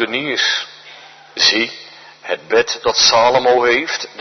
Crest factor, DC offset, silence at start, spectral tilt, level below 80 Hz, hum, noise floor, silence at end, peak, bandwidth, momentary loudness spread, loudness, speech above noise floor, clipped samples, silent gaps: 16 dB; under 0.1%; 0 s; -1 dB/octave; -58 dBFS; none; -40 dBFS; 0 s; 0 dBFS; 6.4 kHz; 17 LU; -14 LUFS; 24 dB; under 0.1%; none